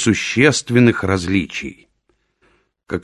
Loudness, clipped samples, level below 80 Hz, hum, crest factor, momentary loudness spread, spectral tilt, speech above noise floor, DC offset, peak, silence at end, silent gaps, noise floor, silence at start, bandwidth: -16 LUFS; under 0.1%; -40 dBFS; none; 18 dB; 14 LU; -5 dB/octave; 49 dB; under 0.1%; 0 dBFS; 0.05 s; none; -65 dBFS; 0 s; 12 kHz